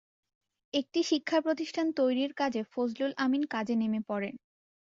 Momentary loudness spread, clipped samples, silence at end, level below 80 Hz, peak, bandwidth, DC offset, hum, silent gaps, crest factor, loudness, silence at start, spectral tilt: 6 LU; under 0.1%; 0.5 s; -76 dBFS; -14 dBFS; 7.8 kHz; under 0.1%; none; none; 16 dB; -31 LUFS; 0.75 s; -4.5 dB/octave